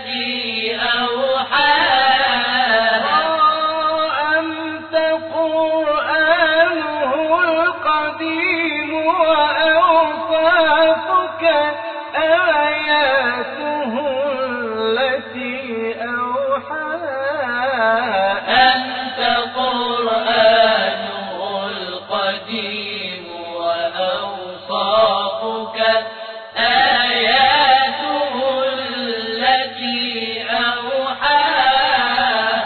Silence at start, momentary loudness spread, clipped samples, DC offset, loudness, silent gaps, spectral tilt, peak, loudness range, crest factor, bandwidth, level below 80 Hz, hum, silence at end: 0 s; 10 LU; under 0.1%; under 0.1%; -17 LUFS; none; -5.5 dB/octave; -2 dBFS; 6 LU; 14 dB; 4.6 kHz; -56 dBFS; none; 0 s